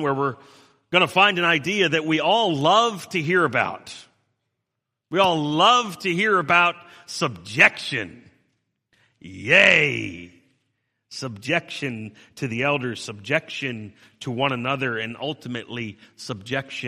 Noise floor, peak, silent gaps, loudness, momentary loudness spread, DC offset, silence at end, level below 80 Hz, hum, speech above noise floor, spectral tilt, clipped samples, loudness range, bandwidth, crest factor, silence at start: -82 dBFS; 0 dBFS; none; -20 LUFS; 18 LU; under 0.1%; 0 s; -66 dBFS; none; 59 dB; -4 dB/octave; under 0.1%; 8 LU; 15 kHz; 24 dB; 0 s